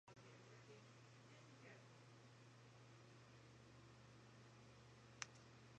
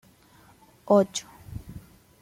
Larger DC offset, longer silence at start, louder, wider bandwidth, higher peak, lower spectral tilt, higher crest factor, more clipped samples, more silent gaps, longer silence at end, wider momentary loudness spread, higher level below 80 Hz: neither; second, 0.05 s vs 0.9 s; second, -64 LUFS vs -24 LUFS; second, 9 kHz vs 16 kHz; second, -26 dBFS vs -8 dBFS; second, -3.5 dB/octave vs -5.5 dB/octave; first, 38 dB vs 20 dB; neither; neither; second, 0 s vs 0.45 s; second, 10 LU vs 24 LU; second, -84 dBFS vs -54 dBFS